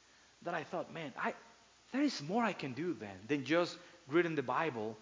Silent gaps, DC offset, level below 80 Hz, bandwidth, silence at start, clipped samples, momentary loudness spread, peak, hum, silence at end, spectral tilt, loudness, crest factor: none; under 0.1%; -78 dBFS; 7.6 kHz; 0.4 s; under 0.1%; 10 LU; -18 dBFS; none; 0 s; -5.5 dB/octave; -37 LUFS; 20 dB